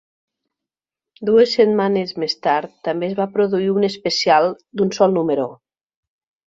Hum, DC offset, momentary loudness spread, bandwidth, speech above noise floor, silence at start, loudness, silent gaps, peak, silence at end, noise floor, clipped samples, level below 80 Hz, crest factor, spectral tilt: none; under 0.1%; 8 LU; 7.8 kHz; 71 dB; 1.2 s; -18 LUFS; none; -2 dBFS; 0.95 s; -89 dBFS; under 0.1%; -64 dBFS; 18 dB; -5.5 dB/octave